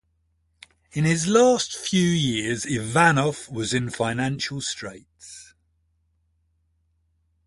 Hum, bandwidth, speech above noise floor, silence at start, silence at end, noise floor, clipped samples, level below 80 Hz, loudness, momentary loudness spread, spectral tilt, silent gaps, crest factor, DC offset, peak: none; 11.5 kHz; 47 dB; 0.95 s; 2.05 s; -69 dBFS; under 0.1%; -56 dBFS; -22 LUFS; 18 LU; -4.5 dB/octave; none; 22 dB; under 0.1%; -4 dBFS